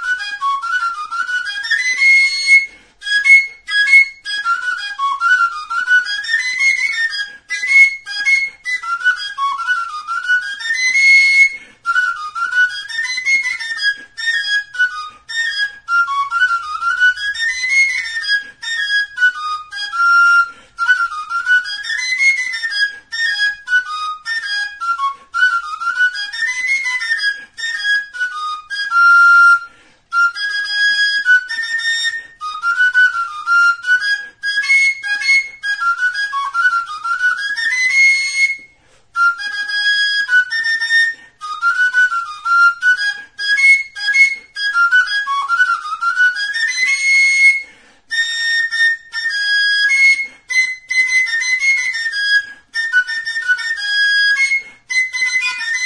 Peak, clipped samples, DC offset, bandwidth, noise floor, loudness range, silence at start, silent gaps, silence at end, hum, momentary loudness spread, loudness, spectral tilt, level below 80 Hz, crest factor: 0 dBFS; under 0.1%; 0.1%; 11 kHz; -50 dBFS; 5 LU; 0 s; none; 0 s; none; 11 LU; -14 LUFS; 4 dB/octave; -62 dBFS; 16 dB